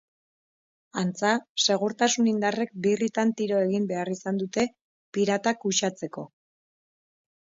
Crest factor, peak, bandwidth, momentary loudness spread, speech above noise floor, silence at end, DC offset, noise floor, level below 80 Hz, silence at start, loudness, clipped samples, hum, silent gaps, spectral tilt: 18 dB; -8 dBFS; 7.8 kHz; 9 LU; over 64 dB; 1.3 s; under 0.1%; under -90 dBFS; -72 dBFS; 0.95 s; -26 LUFS; under 0.1%; none; 1.49-1.55 s, 4.81-5.12 s; -4 dB/octave